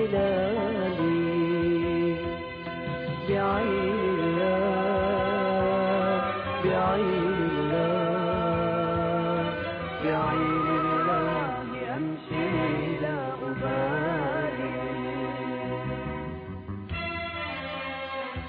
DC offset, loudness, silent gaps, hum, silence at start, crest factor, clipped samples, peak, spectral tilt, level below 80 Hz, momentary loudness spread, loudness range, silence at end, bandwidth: under 0.1%; -27 LUFS; none; none; 0 s; 12 dB; under 0.1%; -14 dBFS; -10.5 dB/octave; -50 dBFS; 8 LU; 6 LU; 0 s; 5 kHz